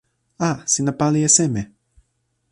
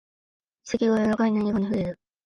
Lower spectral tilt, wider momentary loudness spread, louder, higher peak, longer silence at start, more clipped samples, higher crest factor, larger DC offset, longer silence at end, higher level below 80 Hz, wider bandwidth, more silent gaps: second, -4 dB/octave vs -7 dB/octave; first, 12 LU vs 9 LU; first, -18 LUFS vs -25 LUFS; first, -2 dBFS vs -12 dBFS; second, 0.4 s vs 0.65 s; neither; first, 20 dB vs 14 dB; neither; first, 0.85 s vs 0.3 s; about the same, -54 dBFS vs -56 dBFS; first, 11.5 kHz vs 7.4 kHz; neither